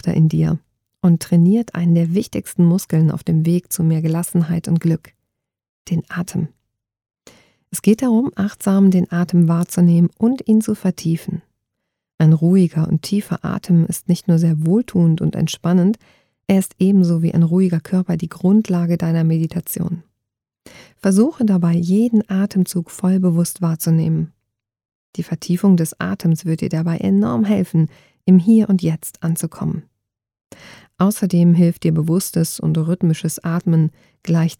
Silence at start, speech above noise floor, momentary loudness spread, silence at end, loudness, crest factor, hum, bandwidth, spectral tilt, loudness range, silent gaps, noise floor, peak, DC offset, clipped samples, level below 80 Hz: 0.05 s; 64 dB; 9 LU; 0.05 s; -17 LUFS; 16 dB; none; 16.5 kHz; -7.5 dB/octave; 4 LU; 5.69-5.85 s, 12.14-12.18 s, 24.95-25.13 s, 30.46-30.50 s; -80 dBFS; -2 dBFS; under 0.1%; under 0.1%; -54 dBFS